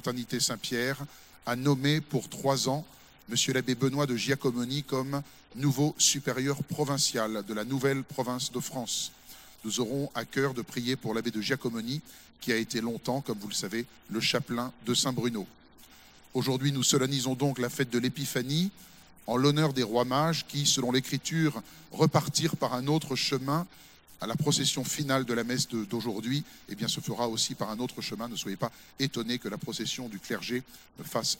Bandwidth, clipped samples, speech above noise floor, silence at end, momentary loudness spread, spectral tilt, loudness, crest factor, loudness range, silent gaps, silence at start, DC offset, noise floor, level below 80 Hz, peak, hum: 16.5 kHz; under 0.1%; 25 dB; 0 s; 10 LU; -4 dB/octave; -30 LUFS; 22 dB; 5 LU; none; 0.05 s; under 0.1%; -55 dBFS; -66 dBFS; -8 dBFS; none